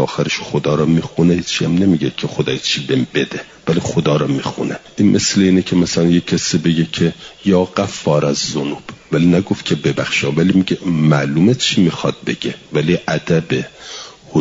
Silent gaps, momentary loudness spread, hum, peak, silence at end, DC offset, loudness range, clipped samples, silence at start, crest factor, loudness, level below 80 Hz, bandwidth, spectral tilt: none; 8 LU; none; -2 dBFS; 0 s; under 0.1%; 2 LU; under 0.1%; 0 s; 14 dB; -16 LUFS; -48 dBFS; 7.8 kHz; -5.5 dB/octave